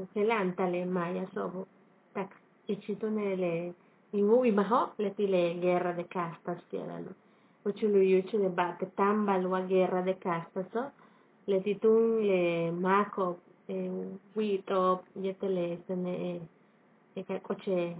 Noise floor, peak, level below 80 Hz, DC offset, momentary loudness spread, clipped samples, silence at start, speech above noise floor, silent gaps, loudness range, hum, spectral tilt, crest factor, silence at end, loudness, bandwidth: -64 dBFS; -14 dBFS; -86 dBFS; under 0.1%; 14 LU; under 0.1%; 0 s; 33 dB; none; 5 LU; none; -6 dB/octave; 18 dB; 0 s; -31 LUFS; 4 kHz